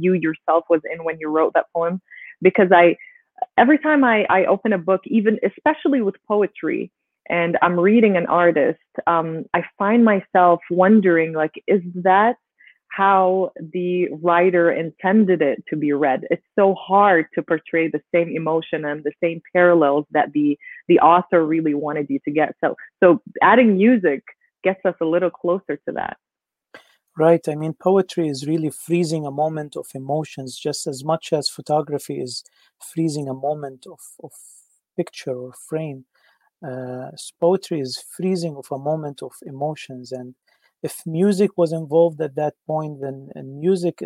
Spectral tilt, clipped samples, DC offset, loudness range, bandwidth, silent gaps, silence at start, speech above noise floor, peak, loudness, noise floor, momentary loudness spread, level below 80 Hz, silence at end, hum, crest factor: -6.5 dB/octave; under 0.1%; under 0.1%; 9 LU; 15 kHz; none; 0 s; 65 dB; -2 dBFS; -19 LUFS; -84 dBFS; 16 LU; -66 dBFS; 0 s; none; 18 dB